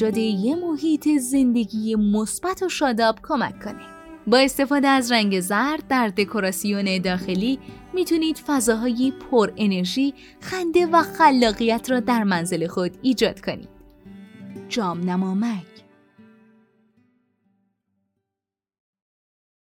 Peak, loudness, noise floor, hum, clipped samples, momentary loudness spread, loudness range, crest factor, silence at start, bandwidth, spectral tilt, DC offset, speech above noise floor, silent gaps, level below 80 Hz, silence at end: -4 dBFS; -21 LUFS; -87 dBFS; none; under 0.1%; 12 LU; 9 LU; 18 dB; 0 s; 18.5 kHz; -4.5 dB/octave; under 0.1%; 66 dB; none; -54 dBFS; 4.15 s